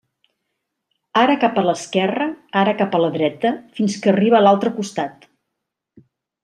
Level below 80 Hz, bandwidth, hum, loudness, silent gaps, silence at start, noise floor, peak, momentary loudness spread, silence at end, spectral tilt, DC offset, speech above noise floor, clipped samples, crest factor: -68 dBFS; 10.5 kHz; none; -18 LUFS; none; 1.15 s; -79 dBFS; -2 dBFS; 10 LU; 1.3 s; -5.5 dB/octave; under 0.1%; 62 dB; under 0.1%; 18 dB